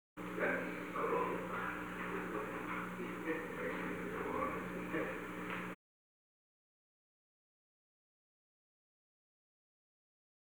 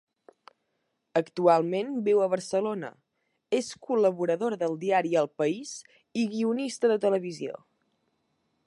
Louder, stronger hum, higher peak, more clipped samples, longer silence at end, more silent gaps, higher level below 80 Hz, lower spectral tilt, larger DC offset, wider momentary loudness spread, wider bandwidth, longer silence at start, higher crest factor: second, -41 LUFS vs -27 LUFS; first, 60 Hz at -60 dBFS vs none; second, -24 dBFS vs -8 dBFS; neither; first, 4.8 s vs 1.15 s; neither; first, -68 dBFS vs -80 dBFS; about the same, -6 dB/octave vs -5.5 dB/octave; neither; second, 6 LU vs 12 LU; first, over 20 kHz vs 11.5 kHz; second, 0.15 s vs 1.15 s; about the same, 20 dB vs 20 dB